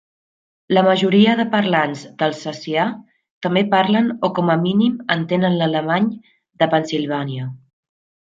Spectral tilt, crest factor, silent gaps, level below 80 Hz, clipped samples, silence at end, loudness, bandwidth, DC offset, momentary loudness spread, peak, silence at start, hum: -6.5 dB/octave; 16 dB; 3.30-3.41 s; -64 dBFS; under 0.1%; 0.7 s; -18 LUFS; 7.6 kHz; under 0.1%; 10 LU; -2 dBFS; 0.7 s; none